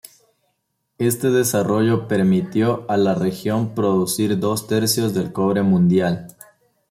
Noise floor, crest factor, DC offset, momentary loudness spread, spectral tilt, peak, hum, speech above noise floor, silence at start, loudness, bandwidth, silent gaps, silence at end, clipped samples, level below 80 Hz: -72 dBFS; 14 dB; under 0.1%; 5 LU; -5.5 dB/octave; -6 dBFS; none; 54 dB; 1 s; -19 LUFS; 16.5 kHz; none; 0.65 s; under 0.1%; -58 dBFS